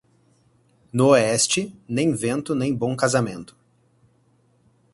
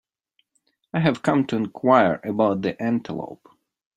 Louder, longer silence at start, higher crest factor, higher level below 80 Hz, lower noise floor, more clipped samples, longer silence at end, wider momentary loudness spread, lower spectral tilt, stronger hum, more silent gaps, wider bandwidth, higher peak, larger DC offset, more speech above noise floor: about the same, -21 LUFS vs -22 LUFS; about the same, 0.95 s vs 0.95 s; about the same, 20 dB vs 22 dB; about the same, -58 dBFS vs -62 dBFS; second, -62 dBFS vs -71 dBFS; neither; first, 1.5 s vs 0.6 s; about the same, 12 LU vs 13 LU; second, -4.5 dB/octave vs -7.5 dB/octave; neither; neither; about the same, 11.5 kHz vs 10.5 kHz; about the same, -4 dBFS vs -2 dBFS; neither; second, 41 dB vs 49 dB